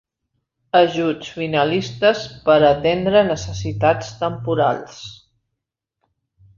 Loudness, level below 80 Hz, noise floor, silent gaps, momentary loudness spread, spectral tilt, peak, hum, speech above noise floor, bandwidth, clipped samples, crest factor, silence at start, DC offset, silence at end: -18 LUFS; -48 dBFS; -81 dBFS; none; 11 LU; -5.5 dB/octave; -2 dBFS; none; 63 dB; 7.4 kHz; under 0.1%; 18 dB; 0.75 s; under 0.1%; 1.4 s